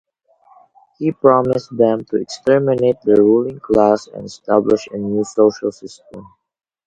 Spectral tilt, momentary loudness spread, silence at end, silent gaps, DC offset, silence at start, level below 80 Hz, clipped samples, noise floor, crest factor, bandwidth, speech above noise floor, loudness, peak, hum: -7 dB/octave; 12 LU; 0.65 s; none; under 0.1%; 1 s; -52 dBFS; under 0.1%; -53 dBFS; 16 dB; 8.8 kHz; 38 dB; -16 LUFS; 0 dBFS; none